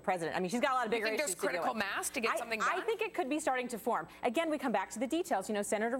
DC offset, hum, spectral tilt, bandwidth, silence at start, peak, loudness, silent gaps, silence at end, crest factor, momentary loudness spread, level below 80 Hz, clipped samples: under 0.1%; none; -3 dB/octave; 17 kHz; 0 s; -16 dBFS; -34 LUFS; none; 0 s; 18 dB; 3 LU; -70 dBFS; under 0.1%